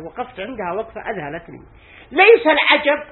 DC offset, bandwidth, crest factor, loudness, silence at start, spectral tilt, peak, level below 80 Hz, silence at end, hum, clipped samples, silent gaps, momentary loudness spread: under 0.1%; 4.3 kHz; 18 dB; -15 LUFS; 0 s; -8.5 dB/octave; 0 dBFS; -52 dBFS; 0.05 s; none; under 0.1%; none; 19 LU